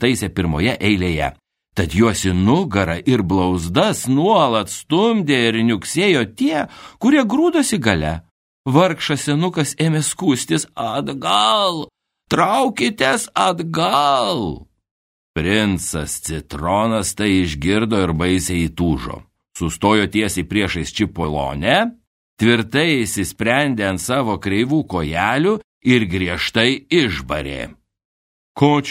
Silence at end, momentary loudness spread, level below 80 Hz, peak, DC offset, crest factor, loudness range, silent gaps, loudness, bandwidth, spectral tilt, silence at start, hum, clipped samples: 0 s; 8 LU; -40 dBFS; 0 dBFS; under 0.1%; 18 dB; 3 LU; 8.31-8.64 s, 14.91-15.34 s, 22.07-22.37 s, 25.64-25.81 s, 28.05-28.55 s; -18 LUFS; 16 kHz; -4.5 dB/octave; 0 s; none; under 0.1%